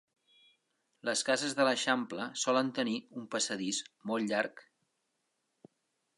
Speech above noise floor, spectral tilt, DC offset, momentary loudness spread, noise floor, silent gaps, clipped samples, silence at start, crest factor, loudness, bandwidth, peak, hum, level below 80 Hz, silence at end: 48 dB; -2.5 dB/octave; under 0.1%; 9 LU; -81 dBFS; none; under 0.1%; 1.05 s; 22 dB; -33 LUFS; 11.5 kHz; -14 dBFS; none; -86 dBFS; 1.55 s